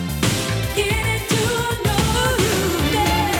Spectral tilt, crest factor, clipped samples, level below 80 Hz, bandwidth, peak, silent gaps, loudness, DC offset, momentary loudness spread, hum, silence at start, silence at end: -4 dB/octave; 14 dB; under 0.1%; -30 dBFS; over 20 kHz; -4 dBFS; none; -19 LUFS; under 0.1%; 3 LU; none; 0 s; 0 s